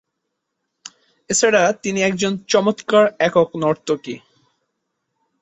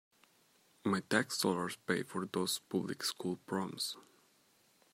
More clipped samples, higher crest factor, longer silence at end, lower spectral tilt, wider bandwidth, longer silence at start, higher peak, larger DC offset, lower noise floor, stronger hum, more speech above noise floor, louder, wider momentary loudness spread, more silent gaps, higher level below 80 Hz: neither; second, 18 dB vs 24 dB; first, 1.25 s vs 0.9 s; about the same, -3.5 dB/octave vs -3.5 dB/octave; second, 8.4 kHz vs 16 kHz; first, 1.3 s vs 0.85 s; first, -2 dBFS vs -14 dBFS; neither; first, -77 dBFS vs -70 dBFS; neither; first, 59 dB vs 34 dB; first, -18 LUFS vs -37 LUFS; about the same, 9 LU vs 7 LU; neither; first, -62 dBFS vs -82 dBFS